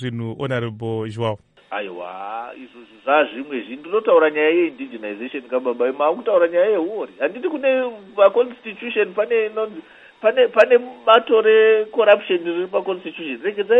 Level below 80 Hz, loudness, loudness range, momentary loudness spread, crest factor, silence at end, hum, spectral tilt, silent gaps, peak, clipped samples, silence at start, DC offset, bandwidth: -68 dBFS; -19 LUFS; 8 LU; 15 LU; 18 dB; 0 s; none; -7 dB/octave; none; 0 dBFS; under 0.1%; 0 s; under 0.1%; 4.9 kHz